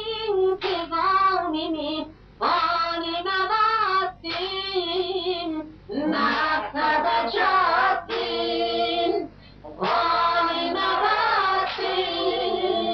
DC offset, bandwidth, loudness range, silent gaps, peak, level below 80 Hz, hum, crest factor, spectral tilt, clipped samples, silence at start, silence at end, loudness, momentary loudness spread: under 0.1%; 6.4 kHz; 2 LU; none; -10 dBFS; -54 dBFS; none; 14 dB; -5 dB/octave; under 0.1%; 0 s; 0 s; -23 LUFS; 8 LU